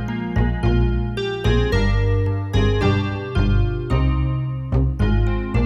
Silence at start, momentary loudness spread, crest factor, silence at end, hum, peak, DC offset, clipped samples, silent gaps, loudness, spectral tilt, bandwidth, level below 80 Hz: 0 s; 4 LU; 12 dB; 0 s; none; -6 dBFS; under 0.1%; under 0.1%; none; -20 LUFS; -8 dB/octave; 7.6 kHz; -24 dBFS